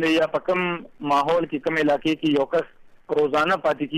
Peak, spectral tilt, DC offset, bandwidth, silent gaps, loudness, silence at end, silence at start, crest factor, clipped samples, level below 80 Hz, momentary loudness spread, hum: -12 dBFS; -5.5 dB/octave; under 0.1%; 14 kHz; none; -22 LUFS; 0 s; 0 s; 10 dB; under 0.1%; -58 dBFS; 6 LU; none